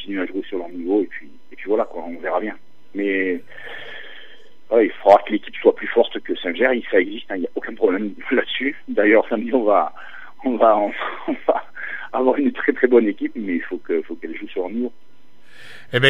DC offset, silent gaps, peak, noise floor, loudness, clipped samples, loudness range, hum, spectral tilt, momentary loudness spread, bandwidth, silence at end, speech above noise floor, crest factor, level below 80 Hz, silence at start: 2%; none; 0 dBFS; -53 dBFS; -20 LUFS; under 0.1%; 6 LU; none; -6.5 dB/octave; 15 LU; 6.2 kHz; 0 s; 33 dB; 20 dB; -70 dBFS; 0 s